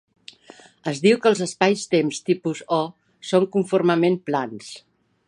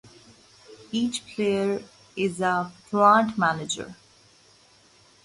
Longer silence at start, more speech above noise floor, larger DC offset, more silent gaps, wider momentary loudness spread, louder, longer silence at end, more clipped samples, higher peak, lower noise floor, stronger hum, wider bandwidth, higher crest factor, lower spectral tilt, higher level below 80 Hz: first, 0.85 s vs 0.7 s; second, 28 dB vs 33 dB; neither; neither; about the same, 14 LU vs 14 LU; first, -21 LUFS vs -24 LUFS; second, 0.5 s vs 1.3 s; neither; first, -2 dBFS vs -6 dBFS; second, -49 dBFS vs -57 dBFS; neither; about the same, 11 kHz vs 11.5 kHz; about the same, 20 dB vs 22 dB; about the same, -5.5 dB/octave vs -4.5 dB/octave; second, -72 dBFS vs -64 dBFS